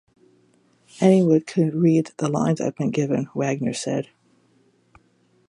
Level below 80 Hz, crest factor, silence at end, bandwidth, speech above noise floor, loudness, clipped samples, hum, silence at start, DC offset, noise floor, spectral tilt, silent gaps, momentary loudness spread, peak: -66 dBFS; 20 dB; 1.45 s; 11 kHz; 41 dB; -21 LUFS; under 0.1%; none; 1 s; under 0.1%; -62 dBFS; -7 dB/octave; none; 9 LU; -4 dBFS